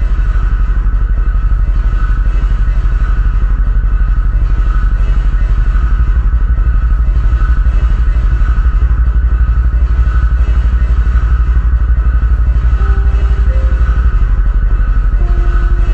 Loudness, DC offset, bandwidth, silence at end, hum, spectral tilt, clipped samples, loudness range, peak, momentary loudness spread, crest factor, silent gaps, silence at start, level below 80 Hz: -14 LUFS; 2%; 3.3 kHz; 0 s; none; -8.5 dB/octave; under 0.1%; 2 LU; 0 dBFS; 2 LU; 8 dB; none; 0 s; -10 dBFS